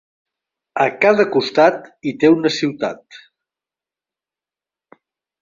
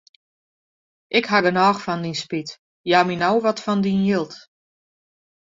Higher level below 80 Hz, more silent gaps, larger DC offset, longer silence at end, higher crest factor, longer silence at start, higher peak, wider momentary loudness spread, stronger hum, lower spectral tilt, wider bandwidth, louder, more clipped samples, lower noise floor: about the same, -64 dBFS vs -62 dBFS; second, none vs 2.59-2.84 s; neither; first, 2.25 s vs 1.05 s; about the same, 18 dB vs 20 dB; second, 0.75 s vs 1.1 s; about the same, -2 dBFS vs -2 dBFS; about the same, 13 LU vs 12 LU; neither; about the same, -5.5 dB/octave vs -5.5 dB/octave; about the same, 7.6 kHz vs 7.8 kHz; first, -16 LUFS vs -20 LUFS; neither; about the same, -90 dBFS vs under -90 dBFS